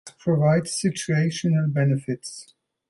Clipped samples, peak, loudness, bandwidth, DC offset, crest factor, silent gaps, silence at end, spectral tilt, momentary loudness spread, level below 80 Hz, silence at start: under 0.1%; -8 dBFS; -23 LUFS; 11.5 kHz; under 0.1%; 16 dB; none; 0.45 s; -6 dB/octave; 12 LU; -62 dBFS; 0.05 s